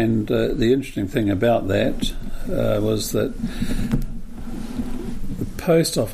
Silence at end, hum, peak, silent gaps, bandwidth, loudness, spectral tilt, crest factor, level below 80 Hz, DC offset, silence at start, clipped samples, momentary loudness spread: 0 s; none; -6 dBFS; none; 15.5 kHz; -22 LUFS; -6 dB/octave; 16 dB; -30 dBFS; under 0.1%; 0 s; under 0.1%; 13 LU